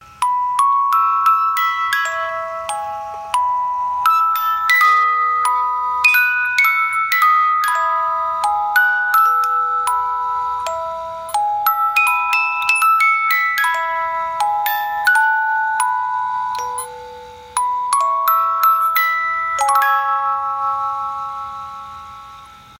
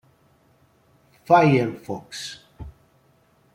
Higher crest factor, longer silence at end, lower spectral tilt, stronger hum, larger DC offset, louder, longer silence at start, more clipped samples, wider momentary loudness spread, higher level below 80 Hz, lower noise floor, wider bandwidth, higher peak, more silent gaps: about the same, 18 dB vs 20 dB; second, 0.05 s vs 0.85 s; second, 1 dB/octave vs -6.5 dB/octave; neither; neither; first, -16 LUFS vs -21 LUFS; second, 0 s vs 1.3 s; neither; second, 11 LU vs 27 LU; about the same, -58 dBFS vs -54 dBFS; second, -40 dBFS vs -60 dBFS; about the same, 17 kHz vs 16 kHz; first, 0 dBFS vs -4 dBFS; neither